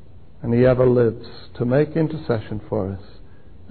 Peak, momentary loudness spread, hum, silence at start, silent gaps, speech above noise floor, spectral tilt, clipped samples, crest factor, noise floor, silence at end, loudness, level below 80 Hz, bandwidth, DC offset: -6 dBFS; 17 LU; none; 0.4 s; none; 25 dB; -12.5 dB/octave; under 0.1%; 16 dB; -45 dBFS; 0.7 s; -20 LUFS; -44 dBFS; 4.5 kHz; 1%